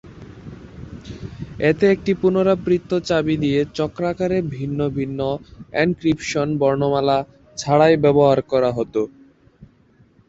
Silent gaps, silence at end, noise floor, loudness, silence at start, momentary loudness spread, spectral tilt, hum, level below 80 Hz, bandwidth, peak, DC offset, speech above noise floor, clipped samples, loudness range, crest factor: none; 0.65 s; -54 dBFS; -19 LUFS; 0.05 s; 20 LU; -6.5 dB/octave; none; -48 dBFS; 8 kHz; -2 dBFS; under 0.1%; 36 dB; under 0.1%; 4 LU; 18 dB